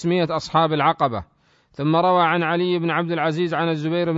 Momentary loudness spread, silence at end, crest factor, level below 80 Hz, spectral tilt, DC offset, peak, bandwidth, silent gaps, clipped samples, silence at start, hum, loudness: 5 LU; 0 s; 16 dB; -56 dBFS; -7 dB/octave; under 0.1%; -4 dBFS; 7.8 kHz; none; under 0.1%; 0 s; none; -20 LUFS